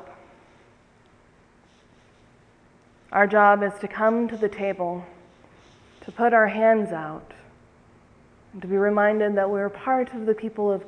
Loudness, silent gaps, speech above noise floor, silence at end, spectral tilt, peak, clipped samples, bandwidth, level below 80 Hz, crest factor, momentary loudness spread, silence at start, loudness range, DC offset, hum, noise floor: -22 LUFS; none; 35 dB; 0.05 s; -7.5 dB/octave; -4 dBFS; under 0.1%; 10 kHz; -64 dBFS; 20 dB; 15 LU; 0 s; 2 LU; under 0.1%; none; -57 dBFS